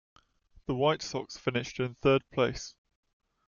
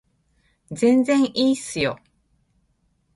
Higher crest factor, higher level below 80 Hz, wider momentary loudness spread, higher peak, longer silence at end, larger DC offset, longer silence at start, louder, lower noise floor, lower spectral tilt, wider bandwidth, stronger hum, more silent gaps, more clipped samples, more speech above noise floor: about the same, 18 dB vs 16 dB; about the same, -56 dBFS vs -60 dBFS; about the same, 13 LU vs 14 LU; second, -14 dBFS vs -6 dBFS; second, 0.75 s vs 1.2 s; neither; about the same, 0.7 s vs 0.7 s; second, -30 LUFS vs -20 LUFS; second, -62 dBFS vs -67 dBFS; about the same, -5.5 dB/octave vs -4.5 dB/octave; second, 7.4 kHz vs 11.5 kHz; neither; neither; neither; second, 32 dB vs 47 dB